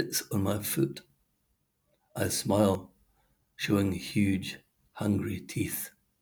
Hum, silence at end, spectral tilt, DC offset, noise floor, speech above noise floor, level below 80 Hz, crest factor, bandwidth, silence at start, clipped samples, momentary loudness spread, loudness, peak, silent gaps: none; 0.3 s; -5 dB/octave; under 0.1%; -76 dBFS; 46 dB; -66 dBFS; 20 dB; over 20 kHz; 0 s; under 0.1%; 12 LU; -30 LUFS; -10 dBFS; none